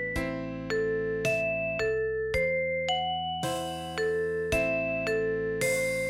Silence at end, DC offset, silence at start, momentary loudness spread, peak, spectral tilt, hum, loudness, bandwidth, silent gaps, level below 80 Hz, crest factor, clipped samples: 0 s; under 0.1%; 0 s; 5 LU; -14 dBFS; -4 dB/octave; none; -29 LUFS; 16.5 kHz; none; -48 dBFS; 14 dB; under 0.1%